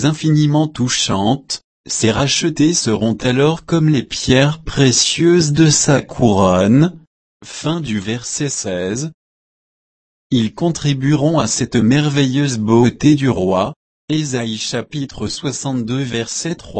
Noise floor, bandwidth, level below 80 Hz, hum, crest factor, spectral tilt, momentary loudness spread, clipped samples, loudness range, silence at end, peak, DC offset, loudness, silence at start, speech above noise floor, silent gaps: under -90 dBFS; 8.8 kHz; -42 dBFS; none; 16 dB; -5 dB/octave; 10 LU; under 0.1%; 8 LU; 0 s; 0 dBFS; under 0.1%; -16 LUFS; 0 s; over 75 dB; 1.64-1.84 s, 7.07-7.40 s, 9.14-10.30 s, 13.76-14.08 s